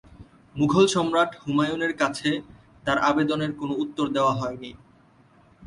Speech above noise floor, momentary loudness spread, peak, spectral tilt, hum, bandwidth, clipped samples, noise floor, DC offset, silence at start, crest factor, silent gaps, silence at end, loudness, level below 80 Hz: 33 dB; 12 LU; -6 dBFS; -5 dB/octave; none; 11.5 kHz; under 0.1%; -56 dBFS; under 0.1%; 0.2 s; 18 dB; none; 0 s; -24 LUFS; -56 dBFS